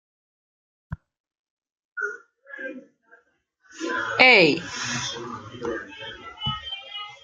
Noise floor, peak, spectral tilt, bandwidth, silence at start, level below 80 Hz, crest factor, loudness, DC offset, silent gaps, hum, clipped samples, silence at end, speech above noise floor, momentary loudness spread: -65 dBFS; 0 dBFS; -3 dB/octave; 9.4 kHz; 0.9 s; -56 dBFS; 26 dB; -21 LUFS; under 0.1%; 1.20-1.24 s, 1.39-1.57 s, 1.72-1.96 s; none; under 0.1%; 0.1 s; 45 dB; 26 LU